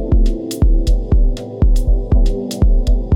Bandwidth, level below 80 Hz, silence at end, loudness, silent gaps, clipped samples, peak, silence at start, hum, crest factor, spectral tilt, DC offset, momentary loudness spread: 12 kHz; -14 dBFS; 0 s; -17 LUFS; none; under 0.1%; -4 dBFS; 0 s; none; 10 dB; -7.5 dB/octave; under 0.1%; 3 LU